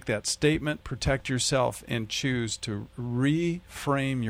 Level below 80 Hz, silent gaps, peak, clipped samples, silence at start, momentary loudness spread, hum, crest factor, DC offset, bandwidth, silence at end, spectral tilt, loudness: -46 dBFS; none; -12 dBFS; under 0.1%; 0.05 s; 8 LU; none; 16 dB; under 0.1%; 16 kHz; 0 s; -4.5 dB/octave; -28 LUFS